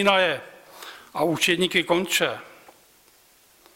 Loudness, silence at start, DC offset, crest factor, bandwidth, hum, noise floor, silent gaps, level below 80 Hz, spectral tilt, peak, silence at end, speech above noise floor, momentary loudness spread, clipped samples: -22 LUFS; 0 s; under 0.1%; 20 dB; 16.5 kHz; none; -57 dBFS; none; -64 dBFS; -3 dB/octave; -6 dBFS; 1.3 s; 35 dB; 21 LU; under 0.1%